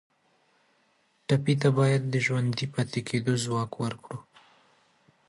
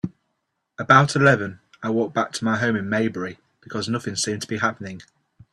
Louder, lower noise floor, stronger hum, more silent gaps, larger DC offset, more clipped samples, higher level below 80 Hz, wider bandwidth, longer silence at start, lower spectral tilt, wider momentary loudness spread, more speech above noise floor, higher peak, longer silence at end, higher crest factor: second, -27 LUFS vs -21 LUFS; second, -68 dBFS vs -76 dBFS; neither; neither; neither; neither; second, -66 dBFS vs -60 dBFS; about the same, 11.5 kHz vs 12.5 kHz; first, 1.3 s vs 0.05 s; about the same, -6 dB/octave vs -5 dB/octave; about the same, 16 LU vs 18 LU; second, 42 dB vs 54 dB; second, -10 dBFS vs 0 dBFS; first, 1.05 s vs 0.5 s; about the same, 20 dB vs 22 dB